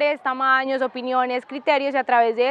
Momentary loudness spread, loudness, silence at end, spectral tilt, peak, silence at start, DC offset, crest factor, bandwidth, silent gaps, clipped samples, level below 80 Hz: 6 LU; -21 LUFS; 0 s; -4 dB/octave; -6 dBFS; 0 s; under 0.1%; 16 dB; 8 kHz; none; under 0.1%; -84 dBFS